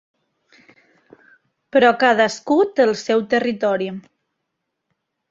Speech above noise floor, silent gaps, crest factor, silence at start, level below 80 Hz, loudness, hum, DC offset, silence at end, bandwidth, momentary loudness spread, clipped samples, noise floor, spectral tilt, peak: 60 dB; none; 20 dB; 1.75 s; -66 dBFS; -18 LUFS; none; under 0.1%; 1.3 s; 7.8 kHz; 8 LU; under 0.1%; -77 dBFS; -4.5 dB/octave; -2 dBFS